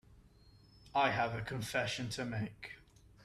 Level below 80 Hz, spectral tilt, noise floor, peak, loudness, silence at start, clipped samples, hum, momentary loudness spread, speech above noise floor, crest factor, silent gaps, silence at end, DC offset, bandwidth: -64 dBFS; -4.5 dB/octave; -63 dBFS; -18 dBFS; -37 LUFS; 0.1 s; under 0.1%; none; 17 LU; 26 dB; 20 dB; none; 0 s; under 0.1%; 14 kHz